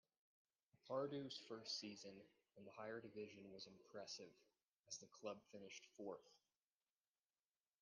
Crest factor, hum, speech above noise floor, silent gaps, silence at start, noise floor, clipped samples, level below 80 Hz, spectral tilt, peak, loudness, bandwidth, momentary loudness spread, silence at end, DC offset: 22 dB; none; over 35 dB; 4.63-4.72 s; 0.85 s; under -90 dBFS; under 0.1%; under -90 dBFS; -3.5 dB/octave; -34 dBFS; -54 LUFS; 9.6 kHz; 12 LU; 1.45 s; under 0.1%